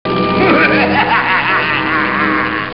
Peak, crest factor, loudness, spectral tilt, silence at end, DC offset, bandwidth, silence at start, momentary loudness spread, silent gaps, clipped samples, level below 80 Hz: -2 dBFS; 12 dB; -12 LUFS; -3 dB/octave; 0.05 s; 0.8%; 5.8 kHz; 0.05 s; 4 LU; none; under 0.1%; -44 dBFS